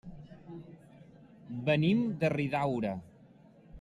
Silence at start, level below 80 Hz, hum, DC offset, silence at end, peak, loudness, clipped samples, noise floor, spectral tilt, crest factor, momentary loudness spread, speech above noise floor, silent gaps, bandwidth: 0.05 s; -62 dBFS; none; under 0.1%; 0 s; -16 dBFS; -31 LUFS; under 0.1%; -58 dBFS; -8 dB/octave; 16 dB; 22 LU; 28 dB; none; 11.5 kHz